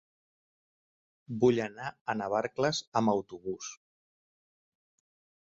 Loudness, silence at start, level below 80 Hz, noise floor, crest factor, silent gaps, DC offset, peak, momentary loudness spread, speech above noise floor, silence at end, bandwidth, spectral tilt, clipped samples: -31 LUFS; 1.3 s; -70 dBFS; under -90 dBFS; 22 dB; 2.01-2.06 s, 2.87-2.92 s; under 0.1%; -12 dBFS; 13 LU; over 59 dB; 1.75 s; 8 kHz; -5 dB/octave; under 0.1%